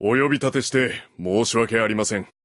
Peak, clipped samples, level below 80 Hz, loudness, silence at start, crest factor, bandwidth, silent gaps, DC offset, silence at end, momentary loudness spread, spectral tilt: -6 dBFS; under 0.1%; -54 dBFS; -21 LUFS; 0 s; 16 dB; 11.5 kHz; none; under 0.1%; 0.2 s; 6 LU; -4 dB/octave